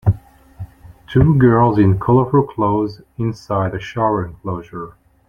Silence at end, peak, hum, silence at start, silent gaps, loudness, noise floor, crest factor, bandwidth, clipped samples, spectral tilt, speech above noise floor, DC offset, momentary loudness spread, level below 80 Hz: 0.4 s; -2 dBFS; none; 0.05 s; none; -17 LUFS; -36 dBFS; 16 dB; 7 kHz; under 0.1%; -9.5 dB/octave; 21 dB; under 0.1%; 21 LU; -38 dBFS